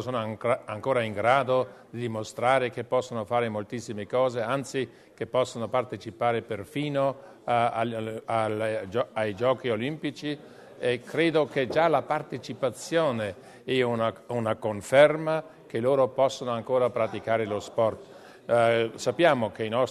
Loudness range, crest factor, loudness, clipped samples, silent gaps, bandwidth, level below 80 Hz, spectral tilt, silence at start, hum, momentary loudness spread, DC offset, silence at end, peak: 4 LU; 22 dB; -27 LUFS; under 0.1%; none; 13.5 kHz; -68 dBFS; -5.5 dB/octave; 0 s; none; 11 LU; under 0.1%; 0 s; -4 dBFS